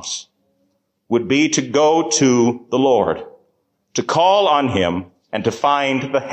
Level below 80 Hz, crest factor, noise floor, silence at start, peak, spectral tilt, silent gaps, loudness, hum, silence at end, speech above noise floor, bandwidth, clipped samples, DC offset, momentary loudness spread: -50 dBFS; 14 dB; -66 dBFS; 0 s; -4 dBFS; -4 dB/octave; none; -17 LUFS; none; 0 s; 50 dB; 9 kHz; under 0.1%; under 0.1%; 12 LU